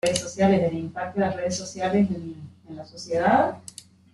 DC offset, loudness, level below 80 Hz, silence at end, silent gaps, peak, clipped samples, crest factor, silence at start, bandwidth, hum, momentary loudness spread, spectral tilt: under 0.1%; -24 LUFS; -58 dBFS; 0.55 s; none; -4 dBFS; under 0.1%; 20 dB; 0.05 s; 12 kHz; none; 20 LU; -5 dB/octave